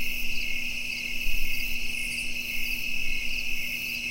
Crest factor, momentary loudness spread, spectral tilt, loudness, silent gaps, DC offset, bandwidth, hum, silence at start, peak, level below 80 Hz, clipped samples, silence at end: 14 dB; 1 LU; -1 dB/octave; -29 LUFS; none; under 0.1%; 16 kHz; none; 0 s; -12 dBFS; -34 dBFS; under 0.1%; 0 s